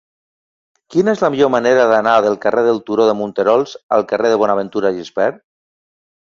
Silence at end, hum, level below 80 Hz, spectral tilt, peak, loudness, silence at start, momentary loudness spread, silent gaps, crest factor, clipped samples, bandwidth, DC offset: 0.95 s; none; -60 dBFS; -5.5 dB/octave; 0 dBFS; -15 LUFS; 0.9 s; 7 LU; 3.83-3.89 s; 16 dB; under 0.1%; 7.4 kHz; under 0.1%